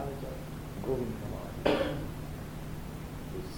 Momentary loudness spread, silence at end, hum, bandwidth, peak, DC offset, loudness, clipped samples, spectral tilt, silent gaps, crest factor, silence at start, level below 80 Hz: 12 LU; 0 s; none; 19.5 kHz; -10 dBFS; under 0.1%; -36 LUFS; under 0.1%; -6 dB/octave; none; 26 dB; 0 s; -46 dBFS